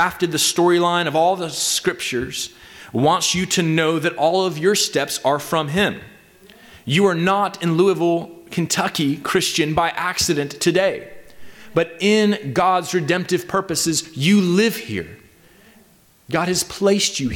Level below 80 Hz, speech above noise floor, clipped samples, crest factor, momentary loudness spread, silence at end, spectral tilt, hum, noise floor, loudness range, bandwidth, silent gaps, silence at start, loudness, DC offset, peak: -52 dBFS; 34 dB; under 0.1%; 14 dB; 8 LU; 0 s; -4 dB/octave; none; -53 dBFS; 2 LU; 18.5 kHz; none; 0 s; -19 LUFS; under 0.1%; -6 dBFS